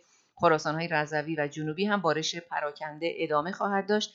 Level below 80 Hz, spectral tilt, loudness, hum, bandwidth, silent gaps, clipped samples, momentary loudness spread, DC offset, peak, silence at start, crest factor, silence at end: -74 dBFS; -4.5 dB/octave; -29 LUFS; none; 7.8 kHz; none; under 0.1%; 8 LU; under 0.1%; -8 dBFS; 0.35 s; 20 dB; 0.05 s